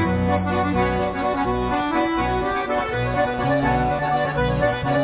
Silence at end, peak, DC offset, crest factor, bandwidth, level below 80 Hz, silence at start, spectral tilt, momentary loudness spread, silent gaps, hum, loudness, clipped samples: 0 s; -6 dBFS; under 0.1%; 14 dB; 4 kHz; -34 dBFS; 0 s; -10.5 dB/octave; 2 LU; none; none; -21 LUFS; under 0.1%